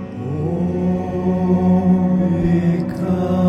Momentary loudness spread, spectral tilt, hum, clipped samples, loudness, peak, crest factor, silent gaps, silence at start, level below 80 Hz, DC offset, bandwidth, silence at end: 6 LU; -10 dB/octave; none; under 0.1%; -18 LUFS; -4 dBFS; 12 dB; none; 0 s; -40 dBFS; under 0.1%; 6.6 kHz; 0 s